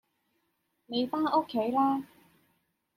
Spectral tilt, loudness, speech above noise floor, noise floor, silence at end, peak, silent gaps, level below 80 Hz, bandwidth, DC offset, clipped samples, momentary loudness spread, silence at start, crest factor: -6.5 dB/octave; -29 LUFS; 49 dB; -77 dBFS; 0.9 s; -14 dBFS; none; -76 dBFS; 16 kHz; under 0.1%; under 0.1%; 8 LU; 0.9 s; 18 dB